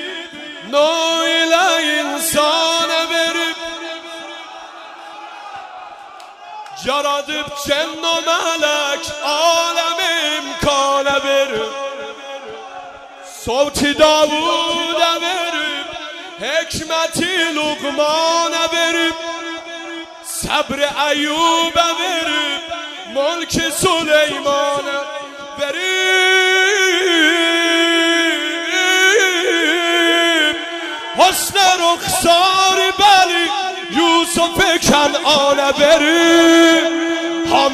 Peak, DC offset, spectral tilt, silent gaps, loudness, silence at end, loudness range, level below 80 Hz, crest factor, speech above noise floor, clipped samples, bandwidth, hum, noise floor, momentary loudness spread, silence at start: 0 dBFS; under 0.1%; -1.5 dB/octave; none; -14 LUFS; 0 s; 7 LU; -46 dBFS; 16 dB; 21 dB; under 0.1%; 15.5 kHz; none; -36 dBFS; 18 LU; 0 s